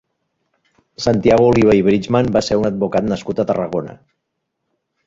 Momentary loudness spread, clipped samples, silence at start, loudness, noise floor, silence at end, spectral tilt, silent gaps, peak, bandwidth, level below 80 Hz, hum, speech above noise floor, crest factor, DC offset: 10 LU; under 0.1%; 1 s; -16 LUFS; -75 dBFS; 1.1 s; -6.5 dB/octave; none; -2 dBFS; 7.8 kHz; -44 dBFS; none; 60 dB; 16 dB; under 0.1%